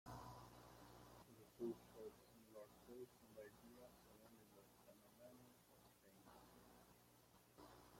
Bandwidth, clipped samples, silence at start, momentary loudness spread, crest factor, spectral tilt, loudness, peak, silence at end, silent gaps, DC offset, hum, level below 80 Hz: 16.5 kHz; under 0.1%; 0.05 s; 14 LU; 22 dB; -5.5 dB/octave; -62 LUFS; -40 dBFS; 0 s; none; under 0.1%; 60 Hz at -80 dBFS; -80 dBFS